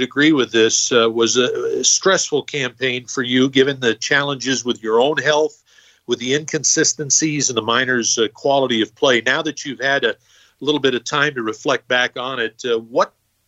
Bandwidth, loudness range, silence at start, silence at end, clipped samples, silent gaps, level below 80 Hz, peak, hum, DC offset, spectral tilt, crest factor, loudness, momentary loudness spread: 8.4 kHz; 3 LU; 0 s; 0.4 s; under 0.1%; none; -66 dBFS; -2 dBFS; none; under 0.1%; -2.5 dB/octave; 16 dB; -17 LUFS; 8 LU